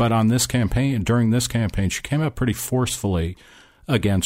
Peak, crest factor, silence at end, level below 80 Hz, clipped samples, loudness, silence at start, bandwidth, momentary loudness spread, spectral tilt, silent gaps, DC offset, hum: -8 dBFS; 14 dB; 0 s; -36 dBFS; under 0.1%; -21 LUFS; 0 s; 16 kHz; 6 LU; -5.5 dB/octave; none; under 0.1%; none